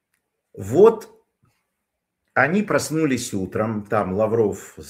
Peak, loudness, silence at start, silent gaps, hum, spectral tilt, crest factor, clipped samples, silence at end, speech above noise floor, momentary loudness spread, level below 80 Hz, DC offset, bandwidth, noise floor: -2 dBFS; -20 LUFS; 0.55 s; none; none; -5.5 dB/octave; 20 dB; under 0.1%; 0 s; 59 dB; 10 LU; -60 dBFS; under 0.1%; 16 kHz; -79 dBFS